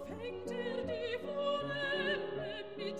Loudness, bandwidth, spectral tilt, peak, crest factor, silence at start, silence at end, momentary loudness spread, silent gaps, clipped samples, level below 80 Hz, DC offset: -38 LUFS; 12 kHz; -5 dB/octave; -24 dBFS; 14 dB; 0 s; 0 s; 7 LU; none; under 0.1%; -68 dBFS; 0.1%